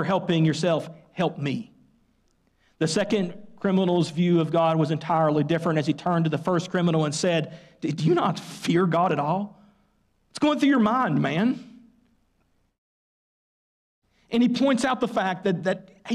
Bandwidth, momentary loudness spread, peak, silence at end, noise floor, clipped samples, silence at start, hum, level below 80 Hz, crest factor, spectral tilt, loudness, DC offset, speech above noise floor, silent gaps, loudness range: 12 kHz; 9 LU; -12 dBFS; 0 s; -68 dBFS; under 0.1%; 0 s; none; -66 dBFS; 12 dB; -6 dB/octave; -24 LUFS; under 0.1%; 45 dB; 12.78-14.02 s; 5 LU